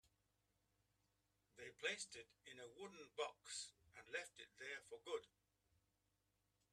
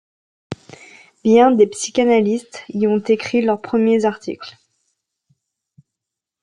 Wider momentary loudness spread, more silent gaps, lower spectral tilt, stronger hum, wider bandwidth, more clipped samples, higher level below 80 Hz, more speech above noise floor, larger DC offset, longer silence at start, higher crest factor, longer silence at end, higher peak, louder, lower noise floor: second, 13 LU vs 21 LU; neither; second, -1 dB/octave vs -5 dB/octave; neither; first, 13 kHz vs 11 kHz; neither; second, -90 dBFS vs -64 dBFS; second, 34 dB vs 68 dB; neither; second, 0.05 s vs 0.5 s; first, 24 dB vs 16 dB; second, 1.45 s vs 1.95 s; second, -32 dBFS vs -2 dBFS; second, -52 LUFS vs -17 LUFS; about the same, -87 dBFS vs -84 dBFS